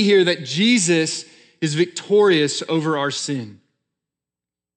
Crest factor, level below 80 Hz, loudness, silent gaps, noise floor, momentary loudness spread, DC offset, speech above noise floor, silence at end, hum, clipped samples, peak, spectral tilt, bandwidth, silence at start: 16 dB; -82 dBFS; -19 LUFS; none; -89 dBFS; 11 LU; under 0.1%; 70 dB; 1.2 s; none; under 0.1%; -4 dBFS; -4 dB/octave; 10 kHz; 0 s